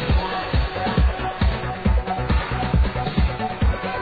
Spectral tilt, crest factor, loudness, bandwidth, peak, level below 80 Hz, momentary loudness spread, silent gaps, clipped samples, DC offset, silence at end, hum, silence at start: -9 dB/octave; 14 dB; -23 LUFS; 5 kHz; -8 dBFS; -24 dBFS; 2 LU; none; under 0.1%; under 0.1%; 0 s; none; 0 s